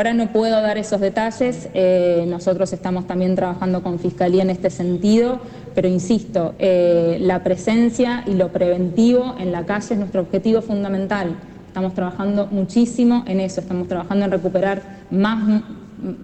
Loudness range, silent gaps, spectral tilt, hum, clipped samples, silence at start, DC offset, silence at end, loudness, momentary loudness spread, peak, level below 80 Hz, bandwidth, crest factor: 3 LU; none; -7 dB/octave; none; under 0.1%; 0 s; under 0.1%; 0 s; -19 LUFS; 8 LU; -6 dBFS; -48 dBFS; 8.8 kHz; 12 dB